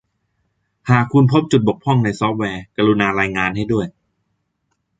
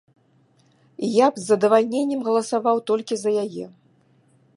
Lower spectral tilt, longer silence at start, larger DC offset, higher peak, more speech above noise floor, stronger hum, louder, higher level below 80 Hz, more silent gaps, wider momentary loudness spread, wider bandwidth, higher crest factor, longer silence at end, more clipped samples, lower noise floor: first, -7 dB/octave vs -5 dB/octave; second, 0.85 s vs 1 s; neither; about the same, -2 dBFS vs -2 dBFS; first, 55 dB vs 40 dB; neither; first, -17 LUFS vs -21 LUFS; first, -48 dBFS vs -78 dBFS; neither; second, 9 LU vs 12 LU; second, 9 kHz vs 11.5 kHz; about the same, 16 dB vs 20 dB; first, 1.1 s vs 0.85 s; neither; first, -71 dBFS vs -60 dBFS